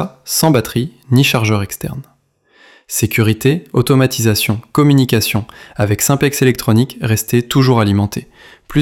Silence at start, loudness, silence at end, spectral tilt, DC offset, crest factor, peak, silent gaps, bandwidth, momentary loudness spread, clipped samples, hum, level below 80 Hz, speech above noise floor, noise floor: 0 s; -14 LUFS; 0 s; -5 dB/octave; under 0.1%; 14 dB; 0 dBFS; none; 17.5 kHz; 9 LU; under 0.1%; none; -44 dBFS; 39 dB; -53 dBFS